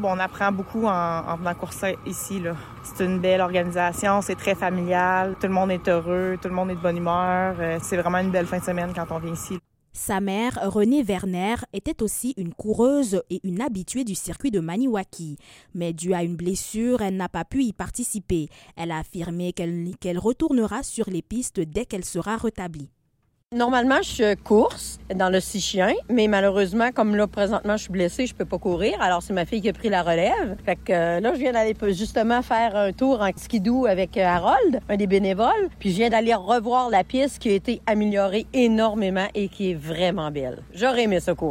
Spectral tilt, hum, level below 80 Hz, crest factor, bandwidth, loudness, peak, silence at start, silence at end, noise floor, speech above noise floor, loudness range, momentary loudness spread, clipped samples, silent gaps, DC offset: -5 dB/octave; none; -46 dBFS; 16 dB; 16.5 kHz; -23 LUFS; -8 dBFS; 0 s; 0 s; -68 dBFS; 45 dB; 5 LU; 9 LU; under 0.1%; 23.46-23.50 s; under 0.1%